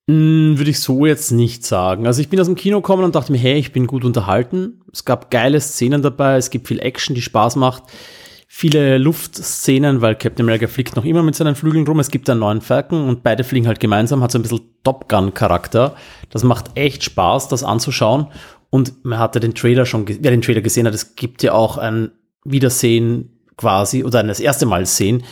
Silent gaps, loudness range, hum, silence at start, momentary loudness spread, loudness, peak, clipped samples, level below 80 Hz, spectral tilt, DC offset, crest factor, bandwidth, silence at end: none; 2 LU; none; 0.1 s; 7 LU; -16 LUFS; -2 dBFS; under 0.1%; -46 dBFS; -5.5 dB/octave; under 0.1%; 14 dB; 18.5 kHz; 0 s